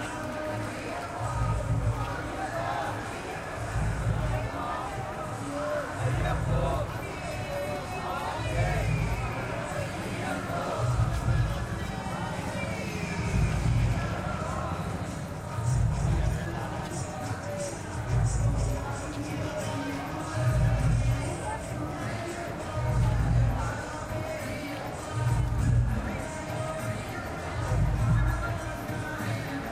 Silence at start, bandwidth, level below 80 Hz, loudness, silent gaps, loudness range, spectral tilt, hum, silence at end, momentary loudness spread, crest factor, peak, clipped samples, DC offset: 0 s; 15.5 kHz; -36 dBFS; -31 LUFS; none; 2 LU; -6 dB/octave; none; 0 s; 8 LU; 16 dB; -14 dBFS; under 0.1%; under 0.1%